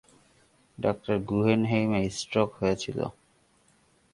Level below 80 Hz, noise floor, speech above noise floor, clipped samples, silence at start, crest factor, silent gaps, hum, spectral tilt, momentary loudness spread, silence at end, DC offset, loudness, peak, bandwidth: -56 dBFS; -65 dBFS; 38 dB; under 0.1%; 0.8 s; 20 dB; none; none; -6 dB/octave; 8 LU; 1 s; under 0.1%; -28 LUFS; -8 dBFS; 11.5 kHz